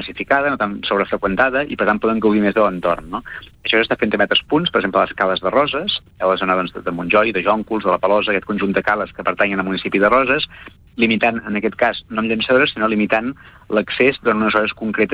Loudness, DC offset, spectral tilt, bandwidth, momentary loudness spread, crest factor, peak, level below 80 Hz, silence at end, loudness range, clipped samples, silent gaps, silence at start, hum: -17 LUFS; under 0.1%; -7.5 dB/octave; 5.4 kHz; 7 LU; 16 dB; -2 dBFS; -46 dBFS; 0 s; 1 LU; under 0.1%; none; 0 s; none